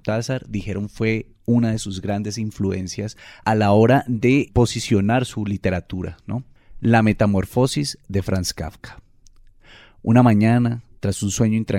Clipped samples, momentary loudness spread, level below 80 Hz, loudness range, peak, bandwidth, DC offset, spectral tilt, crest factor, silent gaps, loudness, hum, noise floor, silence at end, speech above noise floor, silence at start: under 0.1%; 13 LU; -42 dBFS; 4 LU; -2 dBFS; 15 kHz; under 0.1%; -6 dB/octave; 18 dB; none; -20 LUFS; none; -49 dBFS; 0 s; 29 dB; 0.05 s